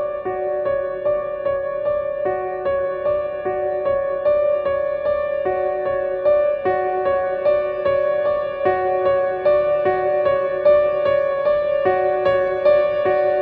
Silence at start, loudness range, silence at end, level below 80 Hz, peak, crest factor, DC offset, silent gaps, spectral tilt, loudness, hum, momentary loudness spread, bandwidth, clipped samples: 0 s; 4 LU; 0 s; -50 dBFS; -6 dBFS; 14 dB; under 0.1%; none; -8.5 dB/octave; -19 LUFS; none; 6 LU; 4.5 kHz; under 0.1%